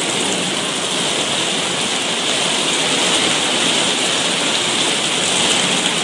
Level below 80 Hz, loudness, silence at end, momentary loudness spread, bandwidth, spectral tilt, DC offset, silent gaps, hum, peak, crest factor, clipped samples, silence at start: -60 dBFS; -15 LUFS; 0 s; 3 LU; 11.5 kHz; -1 dB/octave; under 0.1%; none; none; -2 dBFS; 16 dB; under 0.1%; 0 s